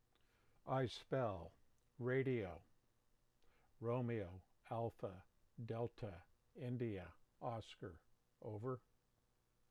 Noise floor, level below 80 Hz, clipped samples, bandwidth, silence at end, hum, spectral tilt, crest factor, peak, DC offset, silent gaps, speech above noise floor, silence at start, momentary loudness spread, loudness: -81 dBFS; -74 dBFS; under 0.1%; 10.5 kHz; 0.9 s; none; -8 dB/octave; 18 dB; -30 dBFS; under 0.1%; none; 36 dB; 0.65 s; 18 LU; -47 LUFS